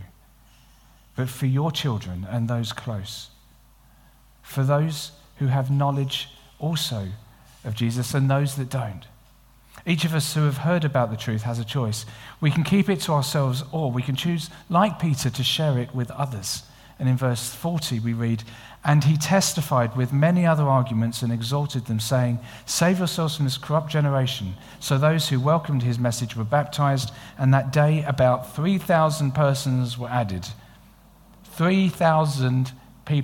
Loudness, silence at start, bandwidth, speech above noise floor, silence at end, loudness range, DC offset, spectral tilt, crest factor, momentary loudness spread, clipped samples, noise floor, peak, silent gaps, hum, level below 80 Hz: -23 LUFS; 0 s; 17 kHz; 31 dB; 0 s; 6 LU; under 0.1%; -5.5 dB/octave; 18 dB; 11 LU; under 0.1%; -54 dBFS; -4 dBFS; none; none; -54 dBFS